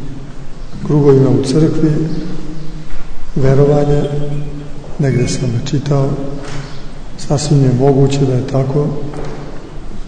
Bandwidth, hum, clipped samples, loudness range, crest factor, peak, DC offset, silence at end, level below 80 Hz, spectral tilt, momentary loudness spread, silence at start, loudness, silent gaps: 9.6 kHz; none; under 0.1%; 4 LU; 12 dB; 0 dBFS; under 0.1%; 0 s; -26 dBFS; -7.5 dB/octave; 20 LU; 0 s; -14 LUFS; none